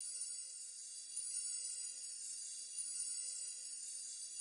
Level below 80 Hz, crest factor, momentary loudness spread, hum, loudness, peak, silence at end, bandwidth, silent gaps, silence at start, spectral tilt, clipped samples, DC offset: under -90 dBFS; 18 dB; 5 LU; none; -43 LUFS; -30 dBFS; 0 s; 11 kHz; none; 0 s; 4.5 dB/octave; under 0.1%; under 0.1%